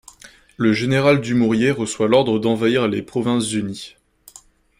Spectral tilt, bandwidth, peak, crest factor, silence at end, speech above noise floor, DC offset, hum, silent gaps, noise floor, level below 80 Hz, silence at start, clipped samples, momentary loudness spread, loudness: -5.5 dB/octave; 15.5 kHz; -2 dBFS; 16 dB; 0.9 s; 31 dB; under 0.1%; none; none; -49 dBFS; -54 dBFS; 0.25 s; under 0.1%; 8 LU; -18 LUFS